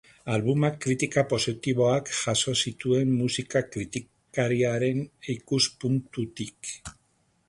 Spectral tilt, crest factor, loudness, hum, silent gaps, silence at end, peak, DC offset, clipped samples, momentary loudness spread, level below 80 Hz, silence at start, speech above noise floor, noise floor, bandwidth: -4.5 dB/octave; 18 dB; -27 LUFS; none; none; 0.55 s; -10 dBFS; under 0.1%; under 0.1%; 11 LU; -58 dBFS; 0.25 s; 42 dB; -69 dBFS; 11.5 kHz